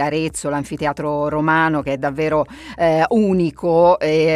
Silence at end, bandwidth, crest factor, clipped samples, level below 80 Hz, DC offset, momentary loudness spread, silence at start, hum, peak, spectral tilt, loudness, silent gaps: 0 s; 13.5 kHz; 14 dB; under 0.1%; -46 dBFS; under 0.1%; 8 LU; 0 s; none; -2 dBFS; -6 dB/octave; -18 LUFS; none